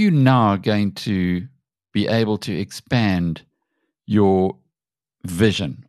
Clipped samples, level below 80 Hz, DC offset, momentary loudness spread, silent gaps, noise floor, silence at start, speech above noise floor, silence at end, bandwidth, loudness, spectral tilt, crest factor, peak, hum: under 0.1%; -50 dBFS; under 0.1%; 13 LU; none; under -90 dBFS; 0 s; over 72 dB; 0.05 s; 13 kHz; -20 LUFS; -7 dB/octave; 18 dB; -2 dBFS; none